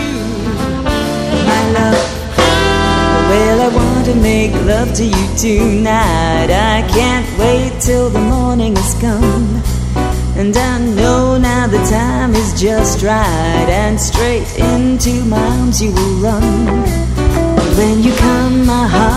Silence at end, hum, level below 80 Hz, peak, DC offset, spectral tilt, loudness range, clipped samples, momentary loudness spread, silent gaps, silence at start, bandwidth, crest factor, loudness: 0 s; none; -18 dBFS; 0 dBFS; under 0.1%; -5 dB/octave; 2 LU; under 0.1%; 4 LU; none; 0 s; 16 kHz; 12 dB; -12 LUFS